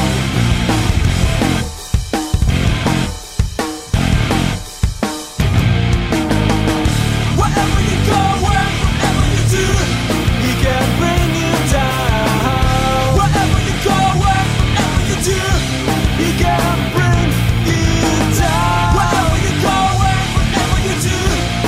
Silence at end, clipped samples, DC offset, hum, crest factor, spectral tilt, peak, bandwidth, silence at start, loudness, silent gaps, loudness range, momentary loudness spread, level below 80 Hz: 0 s; under 0.1%; under 0.1%; none; 14 dB; -5 dB/octave; 0 dBFS; 16 kHz; 0 s; -15 LUFS; none; 3 LU; 5 LU; -22 dBFS